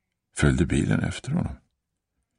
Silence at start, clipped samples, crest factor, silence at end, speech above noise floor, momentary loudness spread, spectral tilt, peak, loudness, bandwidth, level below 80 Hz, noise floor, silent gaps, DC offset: 0.35 s; under 0.1%; 20 dB; 0.85 s; 56 dB; 10 LU; -6 dB/octave; -6 dBFS; -25 LUFS; 10.5 kHz; -38 dBFS; -80 dBFS; none; under 0.1%